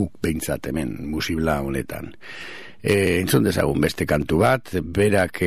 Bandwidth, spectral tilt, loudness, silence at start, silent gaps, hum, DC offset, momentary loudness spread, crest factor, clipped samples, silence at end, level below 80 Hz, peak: 15.5 kHz; -5.5 dB/octave; -22 LUFS; 0 s; none; none; 0.9%; 16 LU; 18 dB; under 0.1%; 0 s; -40 dBFS; -2 dBFS